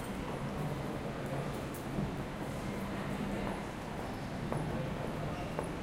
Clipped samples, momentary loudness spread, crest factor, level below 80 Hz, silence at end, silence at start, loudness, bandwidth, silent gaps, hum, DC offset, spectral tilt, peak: under 0.1%; 3 LU; 20 dB; -50 dBFS; 0 s; 0 s; -39 LUFS; 16 kHz; none; none; under 0.1%; -6.5 dB/octave; -18 dBFS